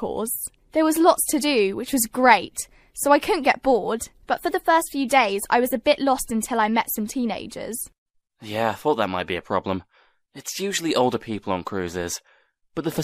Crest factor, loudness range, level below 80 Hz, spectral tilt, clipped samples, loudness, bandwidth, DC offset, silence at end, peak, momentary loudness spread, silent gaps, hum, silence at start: 22 dB; 7 LU; -54 dBFS; -3.5 dB/octave; under 0.1%; -22 LUFS; 15.5 kHz; under 0.1%; 0 s; 0 dBFS; 13 LU; 7.98-8.06 s; none; 0 s